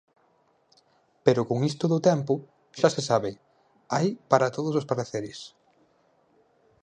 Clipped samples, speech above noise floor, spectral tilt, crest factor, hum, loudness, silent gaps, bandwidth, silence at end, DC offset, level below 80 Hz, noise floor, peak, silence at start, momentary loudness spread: under 0.1%; 41 dB; -6 dB/octave; 24 dB; none; -26 LUFS; none; 10 kHz; 1.35 s; under 0.1%; -70 dBFS; -66 dBFS; -4 dBFS; 1.25 s; 13 LU